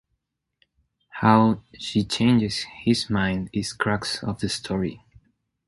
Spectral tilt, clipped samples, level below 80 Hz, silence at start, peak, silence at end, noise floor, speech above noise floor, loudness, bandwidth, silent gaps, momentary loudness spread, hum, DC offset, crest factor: -5.5 dB/octave; under 0.1%; -50 dBFS; 1.15 s; -2 dBFS; 0.7 s; -78 dBFS; 55 dB; -23 LUFS; 11.5 kHz; none; 9 LU; none; under 0.1%; 24 dB